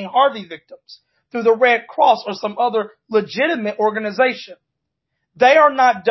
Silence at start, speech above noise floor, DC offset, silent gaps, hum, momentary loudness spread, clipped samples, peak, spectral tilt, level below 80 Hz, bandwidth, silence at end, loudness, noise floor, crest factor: 0 s; 61 dB; under 0.1%; none; none; 15 LU; under 0.1%; -2 dBFS; -4.5 dB/octave; -72 dBFS; 6.2 kHz; 0 s; -16 LUFS; -77 dBFS; 16 dB